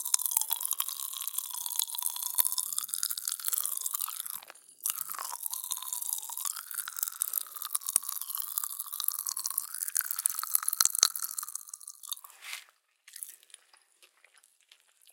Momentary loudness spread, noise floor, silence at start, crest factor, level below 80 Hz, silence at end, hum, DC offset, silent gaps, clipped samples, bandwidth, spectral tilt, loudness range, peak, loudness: 14 LU; -64 dBFS; 0 s; 34 dB; under -90 dBFS; 0 s; none; under 0.1%; none; under 0.1%; 17 kHz; 5.5 dB/octave; 5 LU; -2 dBFS; -31 LUFS